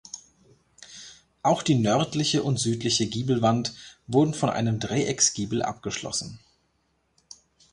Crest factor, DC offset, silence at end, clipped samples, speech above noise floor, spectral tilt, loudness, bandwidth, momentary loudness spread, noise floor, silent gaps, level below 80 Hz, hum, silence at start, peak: 20 dB; under 0.1%; 1.35 s; under 0.1%; 46 dB; -4.5 dB/octave; -25 LUFS; 11.5 kHz; 20 LU; -71 dBFS; none; -58 dBFS; none; 0.15 s; -8 dBFS